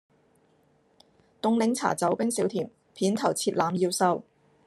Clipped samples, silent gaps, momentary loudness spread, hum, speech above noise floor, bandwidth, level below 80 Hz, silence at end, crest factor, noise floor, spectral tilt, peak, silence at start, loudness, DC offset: under 0.1%; none; 7 LU; none; 39 dB; 13 kHz; -74 dBFS; 0.45 s; 20 dB; -65 dBFS; -4.5 dB/octave; -8 dBFS; 1.45 s; -27 LUFS; under 0.1%